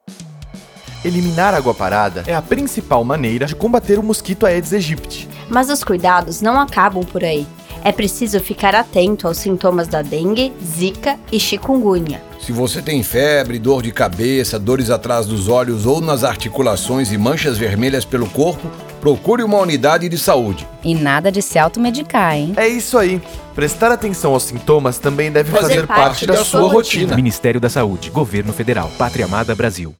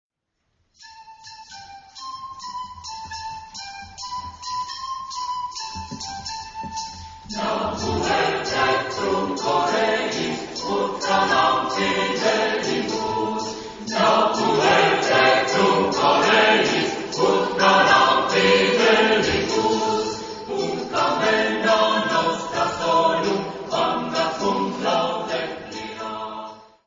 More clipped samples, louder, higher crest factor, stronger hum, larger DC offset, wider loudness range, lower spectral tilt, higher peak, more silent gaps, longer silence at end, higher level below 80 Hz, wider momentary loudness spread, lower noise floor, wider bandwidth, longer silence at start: neither; first, -15 LUFS vs -20 LUFS; about the same, 16 dB vs 18 dB; neither; neither; second, 3 LU vs 14 LU; first, -5 dB/octave vs -3.5 dB/octave; first, 0 dBFS vs -4 dBFS; neither; second, 0.05 s vs 0.25 s; first, -38 dBFS vs -52 dBFS; second, 6 LU vs 17 LU; second, -35 dBFS vs -75 dBFS; first, over 20 kHz vs 7.8 kHz; second, 0.05 s vs 0.8 s